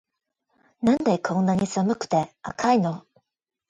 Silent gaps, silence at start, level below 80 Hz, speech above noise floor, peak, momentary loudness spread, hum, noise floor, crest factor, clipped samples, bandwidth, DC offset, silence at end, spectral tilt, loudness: none; 0.8 s; -60 dBFS; 43 dB; -8 dBFS; 7 LU; none; -66 dBFS; 16 dB; under 0.1%; 9.6 kHz; under 0.1%; 0.7 s; -6.5 dB/octave; -24 LUFS